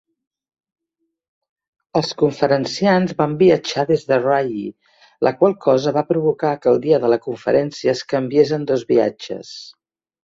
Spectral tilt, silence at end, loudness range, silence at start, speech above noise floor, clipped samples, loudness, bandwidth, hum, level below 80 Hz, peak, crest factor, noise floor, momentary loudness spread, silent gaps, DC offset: -6 dB/octave; 0.55 s; 2 LU; 1.95 s; 58 dB; under 0.1%; -18 LUFS; 7.8 kHz; none; -60 dBFS; 0 dBFS; 18 dB; -75 dBFS; 8 LU; none; under 0.1%